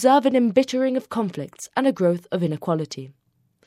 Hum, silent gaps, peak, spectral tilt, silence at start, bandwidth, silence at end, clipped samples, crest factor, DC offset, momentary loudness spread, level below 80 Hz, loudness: none; none; -4 dBFS; -6 dB/octave; 0 s; 15 kHz; 0.55 s; under 0.1%; 18 dB; under 0.1%; 11 LU; -70 dBFS; -22 LUFS